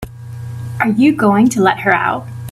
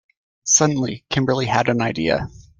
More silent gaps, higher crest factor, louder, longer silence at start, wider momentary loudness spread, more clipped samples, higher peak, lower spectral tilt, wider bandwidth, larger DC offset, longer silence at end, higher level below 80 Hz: neither; about the same, 14 dB vs 18 dB; first, -13 LUFS vs -19 LUFS; second, 0 s vs 0.45 s; first, 17 LU vs 9 LU; neither; about the same, 0 dBFS vs -2 dBFS; first, -6 dB/octave vs -3.5 dB/octave; first, 14 kHz vs 10.5 kHz; neither; second, 0 s vs 0.2 s; about the same, -46 dBFS vs -48 dBFS